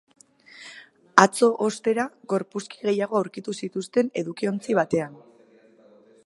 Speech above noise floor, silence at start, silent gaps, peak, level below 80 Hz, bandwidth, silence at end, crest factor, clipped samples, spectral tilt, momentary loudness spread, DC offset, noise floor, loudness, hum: 31 dB; 0.55 s; none; 0 dBFS; -70 dBFS; 11.5 kHz; 1.1 s; 26 dB; under 0.1%; -4.5 dB/octave; 17 LU; under 0.1%; -55 dBFS; -24 LUFS; none